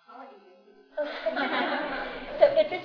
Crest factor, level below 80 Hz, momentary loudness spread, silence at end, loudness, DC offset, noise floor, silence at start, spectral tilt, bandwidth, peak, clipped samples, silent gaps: 22 dB; -56 dBFS; 19 LU; 0 s; -27 LUFS; under 0.1%; -56 dBFS; 0.1 s; -5.5 dB/octave; 5.4 kHz; -6 dBFS; under 0.1%; none